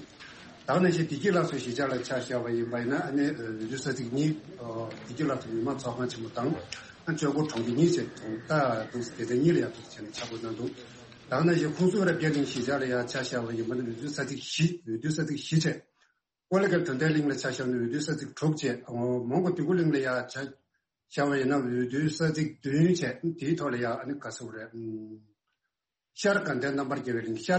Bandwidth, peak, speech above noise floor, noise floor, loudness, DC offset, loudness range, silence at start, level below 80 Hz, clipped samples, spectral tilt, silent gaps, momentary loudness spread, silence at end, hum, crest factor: 8.4 kHz; -12 dBFS; 57 dB; -86 dBFS; -30 LUFS; under 0.1%; 4 LU; 0 s; -66 dBFS; under 0.1%; -6 dB/octave; none; 13 LU; 0 s; none; 18 dB